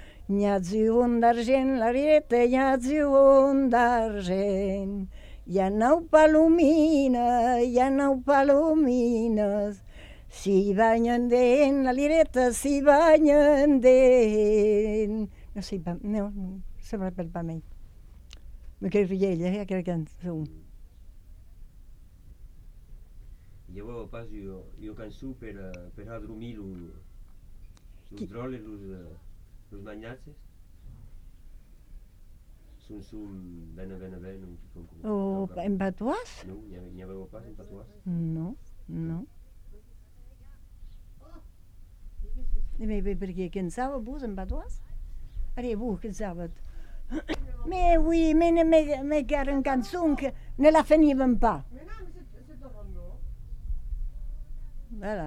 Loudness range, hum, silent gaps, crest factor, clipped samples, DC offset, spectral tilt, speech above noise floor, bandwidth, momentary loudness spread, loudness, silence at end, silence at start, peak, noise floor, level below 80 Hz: 22 LU; none; none; 20 dB; under 0.1%; under 0.1%; -6.5 dB/octave; 26 dB; 13 kHz; 25 LU; -24 LUFS; 0 s; 0 s; -6 dBFS; -51 dBFS; -38 dBFS